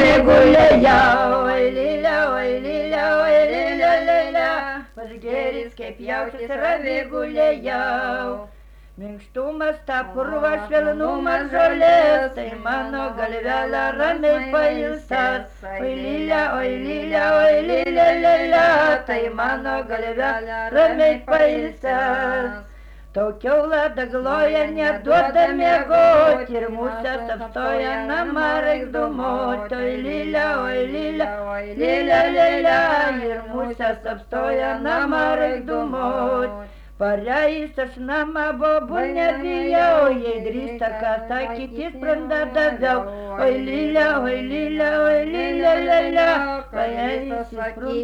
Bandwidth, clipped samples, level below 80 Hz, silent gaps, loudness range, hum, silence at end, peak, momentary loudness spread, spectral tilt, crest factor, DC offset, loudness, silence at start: 8.4 kHz; under 0.1%; -42 dBFS; none; 6 LU; none; 0 s; -4 dBFS; 12 LU; -6 dB/octave; 14 dB; under 0.1%; -19 LUFS; 0 s